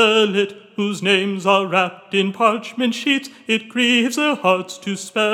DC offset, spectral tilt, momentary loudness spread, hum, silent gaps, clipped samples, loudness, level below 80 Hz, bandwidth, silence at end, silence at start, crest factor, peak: under 0.1%; -4 dB/octave; 8 LU; none; none; under 0.1%; -18 LUFS; -82 dBFS; 16.5 kHz; 0 s; 0 s; 18 dB; -2 dBFS